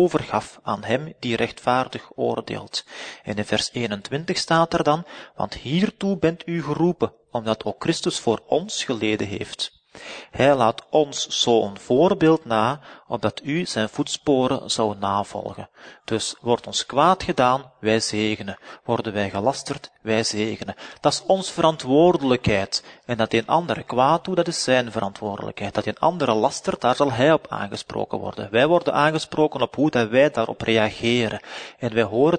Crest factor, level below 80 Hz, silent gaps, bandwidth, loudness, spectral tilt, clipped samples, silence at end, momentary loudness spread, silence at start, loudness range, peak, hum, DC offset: 20 dB; -54 dBFS; none; 9.6 kHz; -22 LUFS; -4.5 dB/octave; under 0.1%; 0 s; 11 LU; 0 s; 4 LU; -2 dBFS; none; under 0.1%